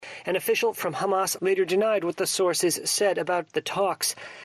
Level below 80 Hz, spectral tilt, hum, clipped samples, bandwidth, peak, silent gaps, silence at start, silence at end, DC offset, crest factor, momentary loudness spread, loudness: -72 dBFS; -2.5 dB/octave; none; under 0.1%; 14 kHz; -12 dBFS; none; 0 s; 0 s; under 0.1%; 12 dB; 5 LU; -25 LUFS